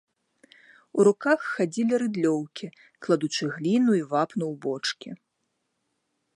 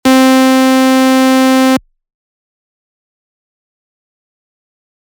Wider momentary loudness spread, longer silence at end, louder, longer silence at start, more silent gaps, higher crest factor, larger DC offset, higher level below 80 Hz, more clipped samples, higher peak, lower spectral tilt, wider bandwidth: first, 17 LU vs 3 LU; second, 1.2 s vs 3.35 s; second, -25 LUFS vs -9 LUFS; first, 0.95 s vs 0.05 s; neither; first, 20 dB vs 12 dB; neither; second, -80 dBFS vs -54 dBFS; neither; second, -8 dBFS vs 0 dBFS; first, -5.5 dB/octave vs -2.5 dB/octave; second, 11.5 kHz vs over 20 kHz